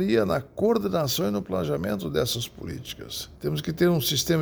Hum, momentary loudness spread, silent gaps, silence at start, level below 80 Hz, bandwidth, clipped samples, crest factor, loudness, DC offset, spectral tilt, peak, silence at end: none; 11 LU; none; 0 s; -50 dBFS; over 20 kHz; under 0.1%; 16 dB; -26 LUFS; under 0.1%; -5 dB/octave; -10 dBFS; 0 s